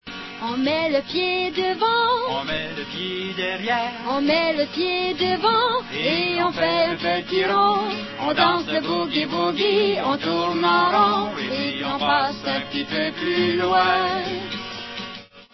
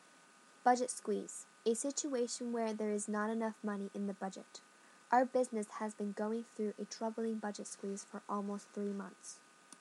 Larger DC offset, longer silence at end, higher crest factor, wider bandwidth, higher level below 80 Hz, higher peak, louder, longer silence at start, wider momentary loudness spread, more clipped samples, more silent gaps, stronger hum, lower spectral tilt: neither; about the same, 0.1 s vs 0.05 s; about the same, 18 dB vs 22 dB; second, 6.2 kHz vs 12 kHz; first, -58 dBFS vs under -90 dBFS; first, -4 dBFS vs -18 dBFS; first, -21 LUFS vs -39 LUFS; second, 0.05 s vs 0.65 s; second, 9 LU vs 13 LU; neither; neither; neither; about the same, -5 dB/octave vs -4.5 dB/octave